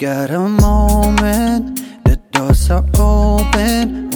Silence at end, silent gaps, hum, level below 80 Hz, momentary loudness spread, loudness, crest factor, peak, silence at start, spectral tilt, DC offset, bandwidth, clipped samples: 0 s; none; none; -16 dBFS; 5 LU; -14 LUFS; 12 dB; 0 dBFS; 0 s; -6 dB/octave; under 0.1%; over 20 kHz; under 0.1%